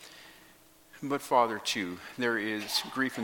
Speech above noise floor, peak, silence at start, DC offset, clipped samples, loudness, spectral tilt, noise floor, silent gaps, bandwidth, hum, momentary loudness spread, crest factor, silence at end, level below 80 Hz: 28 dB; -10 dBFS; 0 s; under 0.1%; under 0.1%; -30 LUFS; -3 dB/octave; -58 dBFS; none; 17.5 kHz; none; 15 LU; 22 dB; 0 s; -74 dBFS